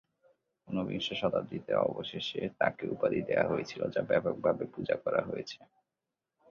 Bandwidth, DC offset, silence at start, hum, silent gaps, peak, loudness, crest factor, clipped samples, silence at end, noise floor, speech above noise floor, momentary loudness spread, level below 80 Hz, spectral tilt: 7.2 kHz; under 0.1%; 0.65 s; none; none; -12 dBFS; -33 LUFS; 20 dB; under 0.1%; 0.85 s; -89 dBFS; 56 dB; 7 LU; -66 dBFS; -6 dB/octave